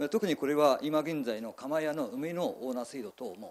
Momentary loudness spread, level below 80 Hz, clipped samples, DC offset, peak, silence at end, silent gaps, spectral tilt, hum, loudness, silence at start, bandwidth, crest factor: 14 LU; -78 dBFS; under 0.1%; under 0.1%; -14 dBFS; 0 s; none; -5.5 dB/octave; none; -32 LUFS; 0 s; 14 kHz; 18 dB